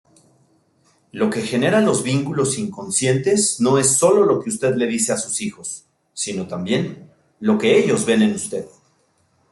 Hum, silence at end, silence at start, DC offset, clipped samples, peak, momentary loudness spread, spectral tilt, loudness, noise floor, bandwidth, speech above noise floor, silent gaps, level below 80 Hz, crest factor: none; 0.85 s; 1.15 s; under 0.1%; under 0.1%; -2 dBFS; 14 LU; -4 dB/octave; -19 LUFS; -62 dBFS; 12.5 kHz; 44 dB; none; -60 dBFS; 18 dB